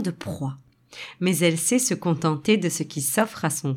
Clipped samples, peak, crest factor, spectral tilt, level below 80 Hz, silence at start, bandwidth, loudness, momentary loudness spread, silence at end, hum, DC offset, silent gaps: under 0.1%; -6 dBFS; 18 dB; -4.5 dB/octave; -62 dBFS; 0 s; 17.5 kHz; -23 LUFS; 12 LU; 0 s; none; under 0.1%; none